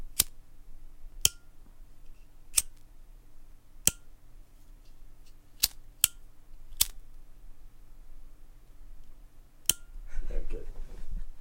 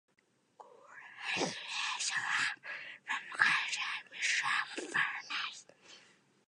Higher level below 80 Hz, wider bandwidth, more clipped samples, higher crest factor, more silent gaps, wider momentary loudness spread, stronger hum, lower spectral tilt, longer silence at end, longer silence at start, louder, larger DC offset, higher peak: first, -42 dBFS vs -90 dBFS; first, 16.5 kHz vs 11 kHz; neither; about the same, 32 dB vs 28 dB; neither; first, 19 LU vs 14 LU; neither; about the same, 0 dB/octave vs -0.5 dB/octave; second, 0 s vs 0.5 s; second, 0 s vs 0.6 s; first, -29 LUFS vs -34 LUFS; neither; first, -2 dBFS vs -10 dBFS